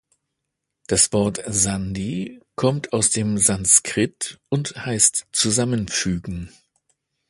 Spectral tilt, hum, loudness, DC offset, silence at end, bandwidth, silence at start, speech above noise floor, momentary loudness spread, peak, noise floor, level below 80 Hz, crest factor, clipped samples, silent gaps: -3.5 dB/octave; none; -19 LUFS; under 0.1%; 0.8 s; 12 kHz; 0.9 s; 59 dB; 14 LU; 0 dBFS; -80 dBFS; -46 dBFS; 22 dB; under 0.1%; none